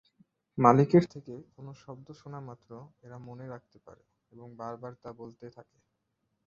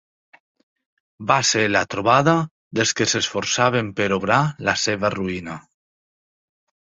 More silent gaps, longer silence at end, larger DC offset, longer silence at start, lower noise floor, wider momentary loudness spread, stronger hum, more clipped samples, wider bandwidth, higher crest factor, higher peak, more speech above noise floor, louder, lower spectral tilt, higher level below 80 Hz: second, none vs 2.51-2.71 s; second, 1 s vs 1.25 s; neither; second, 0.55 s vs 1.2 s; second, -80 dBFS vs under -90 dBFS; first, 27 LU vs 10 LU; neither; neither; second, 7.4 kHz vs 8.2 kHz; first, 26 dB vs 20 dB; second, -6 dBFS vs -2 dBFS; second, 49 dB vs over 70 dB; second, -25 LUFS vs -20 LUFS; first, -9 dB/octave vs -3.5 dB/octave; second, -70 dBFS vs -54 dBFS